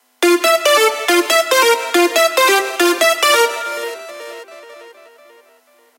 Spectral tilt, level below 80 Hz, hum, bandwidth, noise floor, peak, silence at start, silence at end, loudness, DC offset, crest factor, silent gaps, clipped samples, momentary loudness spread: 1.5 dB/octave; -78 dBFS; none; 17 kHz; -52 dBFS; 0 dBFS; 0.2 s; 1.1 s; -13 LUFS; under 0.1%; 16 dB; none; under 0.1%; 17 LU